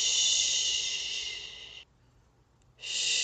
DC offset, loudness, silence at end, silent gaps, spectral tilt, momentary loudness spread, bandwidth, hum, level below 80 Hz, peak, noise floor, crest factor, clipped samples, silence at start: under 0.1%; -27 LUFS; 0 s; none; 3 dB/octave; 21 LU; 9.4 kHz; none; -64 dBFS; -14 dBFS; -64 dBFS; 18 dB; under 0.1%; 0 s